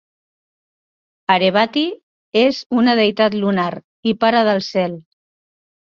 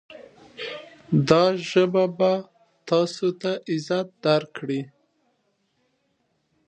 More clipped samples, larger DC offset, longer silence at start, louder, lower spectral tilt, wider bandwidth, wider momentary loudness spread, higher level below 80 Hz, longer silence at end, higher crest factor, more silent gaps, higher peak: neither; neither; first, 1.3 s vs 0.1 s; first, -17 LUFS vs -23 LUFS; about the same, -6 dB/octave vs -6.5 dB/octave; second, 7.4 kHz vs 9.4 kHz; second, 10 LU vs 16 LU; about the same, -62 dBFS vs -64 dBFS; second, 0.95 s vs 1.8 s; second, 18 dB vs 24 dB; first, 2.03-2.32 s, 2.66-2.70 s, 3.84-4.03 s vs none; about the same, -2 dBFS vs -2 dBFS